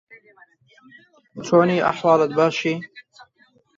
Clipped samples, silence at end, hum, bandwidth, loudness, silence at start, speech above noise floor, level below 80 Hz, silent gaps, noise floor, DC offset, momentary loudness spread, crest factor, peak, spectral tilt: under 0.1%; 0.75 s; none; 7.6 kHz; -19 LUFS; 0.1 s; 40 dB; -64 dBFS; none; -60 dBFS; under 0.1%; 20 LU; 20 dB; -2 dBFS; -6 dB/octave